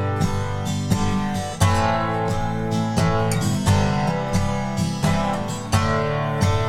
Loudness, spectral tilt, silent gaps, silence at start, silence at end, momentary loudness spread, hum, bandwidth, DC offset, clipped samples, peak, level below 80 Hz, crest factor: -22 LUFS; -6 dB/octave; none; 0 s; 0 s; 5 LU; none; 16 kHz; under 0.1%; under 0.1%; -2 dBFS; -34 dBFS; 18 dB